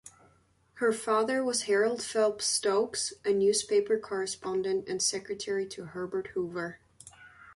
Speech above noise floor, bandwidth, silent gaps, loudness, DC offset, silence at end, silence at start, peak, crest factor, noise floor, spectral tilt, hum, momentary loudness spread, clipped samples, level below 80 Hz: 36 dB; 11.5 kHz; none; -29 LUFS; under 0.1%; 0.05 s; 0.05 s; -16 dBFS; 16 dB; -66 dBFS; -2.5 dB/octave; none; 9 LU; under 0.1%; -70 dBFS